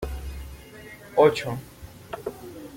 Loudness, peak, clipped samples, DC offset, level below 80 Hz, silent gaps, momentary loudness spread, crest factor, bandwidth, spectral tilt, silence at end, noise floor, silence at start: -25 LUFS; -4 dBFS; under 0.1%; under 0.1%; -42 dBFS; none; 23 LU; 22 dB; 16.5 kHz; -5.5 dB/octave; 0 s; -44 dBFS; 0 s